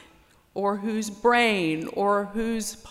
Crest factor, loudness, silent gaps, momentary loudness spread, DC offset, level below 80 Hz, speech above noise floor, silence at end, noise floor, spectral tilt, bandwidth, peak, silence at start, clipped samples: 16 dB; -25 LUFS; none; 9 LU; under 0.1%; -54 dBFS; 32 dB; 0 s; -57 dBFS; -4 dB/octave; 16 kHz; -10 dBFS; 0.55 s; under 0.1%